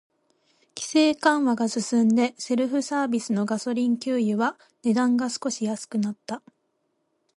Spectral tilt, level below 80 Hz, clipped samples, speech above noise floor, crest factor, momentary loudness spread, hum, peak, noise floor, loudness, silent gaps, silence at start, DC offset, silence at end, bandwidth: -4.5 dB/octave; -74 dBFS; under 0.1%; 50 dB; 18 dB; 9 LU; none; -6 dBFS; -73 dBFS; -24 LUFS; none; 0.75 s; under 0.1%; 1 s; 11.5 kHz